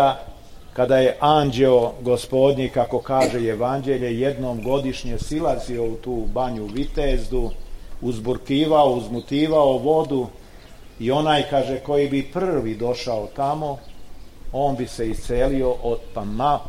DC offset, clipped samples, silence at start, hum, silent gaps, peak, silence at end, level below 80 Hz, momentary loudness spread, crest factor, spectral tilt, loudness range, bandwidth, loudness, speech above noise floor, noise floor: 0.2%; under 0.1%; 0 s; none; none; -4 dBFS; 0 s; -34 dBFS; 11 LU; 16 dB; -6.5 dB/octave; 6 LU; 15.5 kHz; -22 LUFS; 21 dB; -42 dBFS